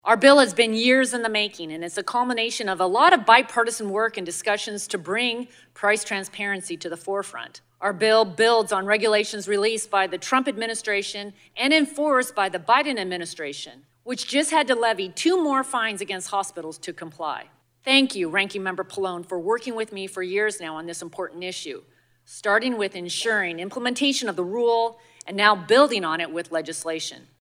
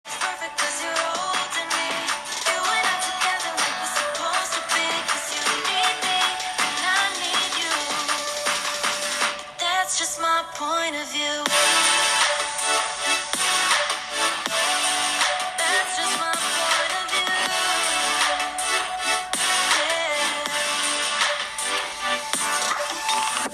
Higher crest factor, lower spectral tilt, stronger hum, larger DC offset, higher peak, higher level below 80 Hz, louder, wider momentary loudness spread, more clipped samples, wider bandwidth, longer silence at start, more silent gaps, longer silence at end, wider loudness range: about the same, 24 dB vs 22 dB; first, -2.5 dB/octave vs 1 dB/octave; neither; neither; about the same, 0 dBFS vs -2 dBFS; second, -78 dBFS vs -62 dBFS; about the same, -22 LUFS vs -22 LUFS; first, 15 LU vs 5 LU; neither; about the same, 16 kHz vs 15 kHz; about the same, 0.05 s vs 0.05 s; neither; first, 0.25 s vs 0 s; first, 6 LU vs 3 LU